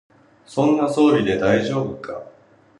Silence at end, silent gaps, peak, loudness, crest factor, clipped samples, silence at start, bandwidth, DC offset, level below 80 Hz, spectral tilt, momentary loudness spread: 0.5 s; none; -4 dBFS; -19 LUFS; 16 dB; under 0.1%; 0.5 s; 11.5 kHz; under 0.1%; -52 dBFS; -6.5 dB/octave; 16 LU